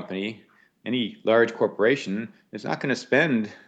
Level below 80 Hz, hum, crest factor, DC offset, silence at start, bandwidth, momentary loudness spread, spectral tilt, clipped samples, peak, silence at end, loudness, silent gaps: -80 dBFS; none; 18 dB; under 0.1%; 0 s; 8.6 kHz; 13 LU; -5.5 dB/octave; under 0.1%; -8 dBFS; 0.1 s; -24 LUFS; none